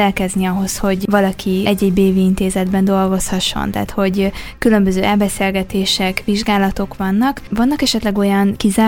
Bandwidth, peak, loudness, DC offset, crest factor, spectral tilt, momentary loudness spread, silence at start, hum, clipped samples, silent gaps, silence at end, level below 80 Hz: 17 kHz; 0 dBFS; -16 LUFS; under 0.1%; 16 dB; -5 dB/octave; 4 LU; 0 s; none; under 0.1%; none; 0 s; -34 dBFS